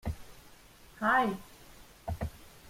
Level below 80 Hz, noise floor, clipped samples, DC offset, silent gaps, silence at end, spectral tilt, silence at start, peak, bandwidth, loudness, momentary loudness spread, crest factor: -50 dBFS; -56 dBFS; under 0.1%; under 0.1%; none; 0 s; -6 dB/octave; 0.05 s; -16 dBFS; 16.5 kHz; -32 LUFS; 27 LU; 20 dB